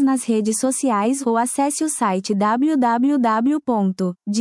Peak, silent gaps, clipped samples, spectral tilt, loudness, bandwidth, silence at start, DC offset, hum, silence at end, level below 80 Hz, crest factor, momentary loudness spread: -6 dBFS; none; under 0.1%; -5 dB/octave; -19 LUFS; 12 kHz; 0 s; under 0.1%; none; 0 s; -70 dBFS; 12 dB; 3 LU